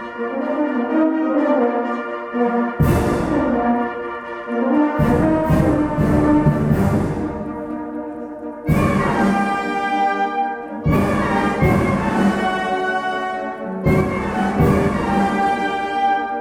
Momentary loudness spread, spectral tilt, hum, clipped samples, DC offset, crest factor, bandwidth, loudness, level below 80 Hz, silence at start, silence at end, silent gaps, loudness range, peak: 9 LU; -7.5 dB/octave; none; under 0.1%; under 0.1%; 14 dB; 17 kHz; -19 LUFS; -34 dBFS; 0 s; 0 s; none; 3 LU; -4 dBFS